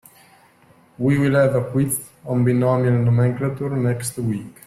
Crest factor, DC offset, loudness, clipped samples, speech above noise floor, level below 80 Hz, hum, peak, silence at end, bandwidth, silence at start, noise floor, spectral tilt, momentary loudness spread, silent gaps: 14 dB; under 0.1%; -20 LUFS; under 0.1%; 34 dB; -54 dBFS; none; -6 dBFS; 0.15 s; 15 kHz; 1 s; -53 dBFS; -7 dB/octave; 8 LU; none